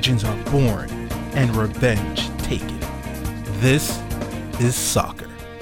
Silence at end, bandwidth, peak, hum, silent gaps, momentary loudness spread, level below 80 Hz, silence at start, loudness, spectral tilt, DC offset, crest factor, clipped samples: 0 s; 18 kHz; -4 dBFS; none; none; 11 LU; -34 dBFS; 0 s; -22 LUFS; -5 dB/octave; under 0.1%; 18 dB; under 0.1%